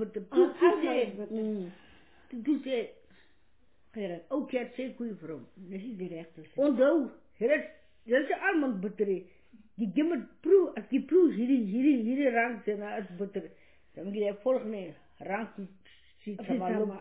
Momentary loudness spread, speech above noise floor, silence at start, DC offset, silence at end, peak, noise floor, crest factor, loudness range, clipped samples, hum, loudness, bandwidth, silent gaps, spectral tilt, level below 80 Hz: 18 LU; 40 dB; 0 s; under 0.1%; 0 s; -12 dBFS; -70 dBFS; 18 dB; 9 LU; under 0.1%; none; -30 LUFS; 4 kHz; none; -5 dB/octave; -72 dBFS